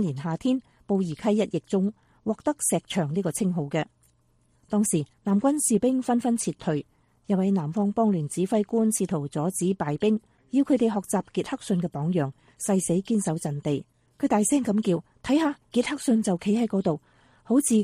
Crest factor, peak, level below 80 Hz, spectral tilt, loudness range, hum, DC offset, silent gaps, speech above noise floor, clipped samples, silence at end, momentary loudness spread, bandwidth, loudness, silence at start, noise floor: 16 dB; -10 dBFS; -62 dBFS; -5.5 dB/octave; 2 LU; none; under 0.1%; none; 40 dB; under 0.1%; 0 s; 7 LU; 15 kHz; -26 LUFS; 0 s; -65 dBFS